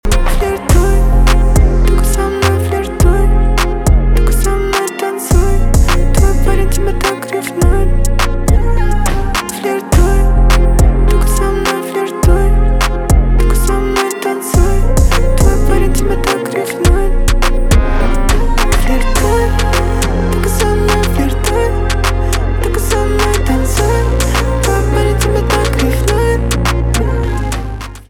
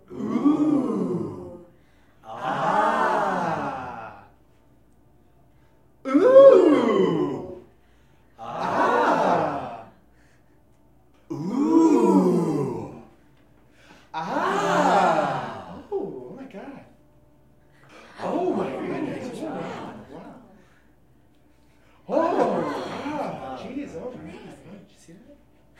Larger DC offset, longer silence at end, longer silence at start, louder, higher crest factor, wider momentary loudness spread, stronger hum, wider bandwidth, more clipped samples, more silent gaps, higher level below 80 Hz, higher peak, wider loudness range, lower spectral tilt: second, under 0.1% vs 0.1%; second, 0.1 s vs 0.65 s; about the same, 0.05 s vs 0.1 s; first, -13 LUFS vs -22 LUFS; second, 10 dB vs 22 dB; second, 4 LU vs 22 LU; neither; first, 16.5 kHz vs 11 kHz; neither; neither; first, -12 dBFS vs -64 dBFS; about the same, 0 dBFS vs -2 dBFS; second, 1 LU vs 13 LU; second, -5 dB/octave vs -6.5 dB/octave